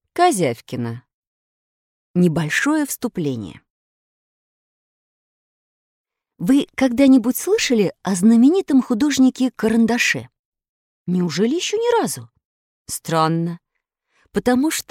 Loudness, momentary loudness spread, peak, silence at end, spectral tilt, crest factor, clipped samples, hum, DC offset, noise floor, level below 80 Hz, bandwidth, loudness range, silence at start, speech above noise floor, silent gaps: -18 LUFS; 13 LU; -2 dBFS; 0.1 s; -5 dB/octave; 18 dB; under 0.1%; none; under 0.1%; -75 dBFS; -56 dBFS; 16.5 kHz; 10 LU; 0.15 s; 58 dB; 1.14-2.14 s, 3.70-6.05 s, 10.39-10.52 s, 10.69-11.05 s, 12.45-12.85 s